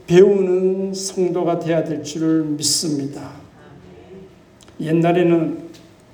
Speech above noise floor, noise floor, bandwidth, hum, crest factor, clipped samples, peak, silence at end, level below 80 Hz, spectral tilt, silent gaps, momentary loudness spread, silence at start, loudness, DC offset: 29 dB; -46 dBFS; over 20 kHz; none; 18 dB; under 0.1%; -2 dBFS; 0.4 s; -58 dBFS; -5 dB/octave; none; 16 LU; 0.1 s; -18 LUFS; under 0.1%